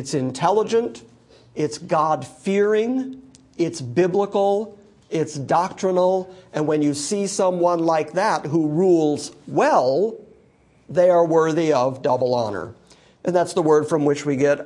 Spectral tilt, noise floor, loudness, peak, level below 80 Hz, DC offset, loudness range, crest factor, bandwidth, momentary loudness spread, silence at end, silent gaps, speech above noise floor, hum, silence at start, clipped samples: -5.5 dB/octave; -55 dBFS; -20 LUFS; -4 dBFS; -66 dBFS; under 0.1%; 3 LU; 16 dB; 11.5 kHz; 9 LU; 0 s; none; 36 dB; none; 0 s; under 0.1%